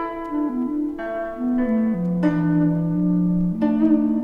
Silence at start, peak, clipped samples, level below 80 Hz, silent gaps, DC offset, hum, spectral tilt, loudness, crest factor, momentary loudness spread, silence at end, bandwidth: 0 s; -8 dBFS; under 0.1%; -44 dBFS; none; under 0.1%; none; -10.5 dB/octave; -21 LUFS; 12 dB; 8 LU; 0 s; 3.8 kHz